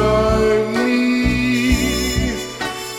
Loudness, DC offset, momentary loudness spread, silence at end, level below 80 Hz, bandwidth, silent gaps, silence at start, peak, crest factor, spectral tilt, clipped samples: -17 LUFS; under 0.1%; 8 LU; 0 s; -28 dBFS; 17 kHz; none; 0 s; -4 dBFS; 14 dB; -5 dB/octave; under 0.1%